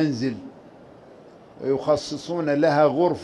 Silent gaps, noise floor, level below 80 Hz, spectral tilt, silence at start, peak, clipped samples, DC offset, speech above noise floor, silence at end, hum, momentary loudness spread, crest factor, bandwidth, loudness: none; -47 dBFS; -60 dBFS; -6.5 dB/octave; 0 s; -6 dBFS; under 0.1%; under 0.1%; 25 dB; 0 s; none; 14 LU; 16 dB; 11 kHz; -23 LUFS